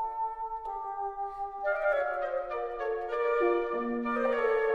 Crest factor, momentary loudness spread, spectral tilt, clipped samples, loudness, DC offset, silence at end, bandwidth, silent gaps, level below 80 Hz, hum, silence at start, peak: 14 dB; 9 LU; -6 dB/octave; under 0.1%; -31 LUFS; under 0.1%; 0 s; 6.4 kHz; none; -58 dBFS; none; 0 s; -16 dBFS